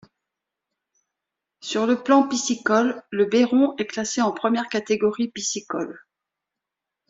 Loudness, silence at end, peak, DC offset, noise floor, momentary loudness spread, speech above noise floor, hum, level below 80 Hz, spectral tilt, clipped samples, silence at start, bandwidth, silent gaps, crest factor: -22 LUFS; 1.1 s; -4 dBFS; under 0.1%; -85 dBFS; 10 LU; 64 dB; none; -68 dBFS; -3.5 dB/octave; under 0.1%; 1.65 s; 7.8 kHz; none; 20 dB